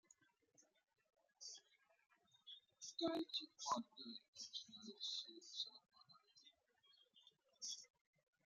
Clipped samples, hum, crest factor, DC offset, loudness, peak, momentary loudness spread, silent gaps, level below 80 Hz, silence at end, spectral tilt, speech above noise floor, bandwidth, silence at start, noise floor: under 0.1%; none; 24 dB; under 0.1%; -50 LUFS; -30 dBFS; 22 LU; 4.28-4.33 s; under -90 dBFS; 0.6 s; -2 dB/octave; 29 dB; 12.5 kHz; 0.6 s; -78 dBFS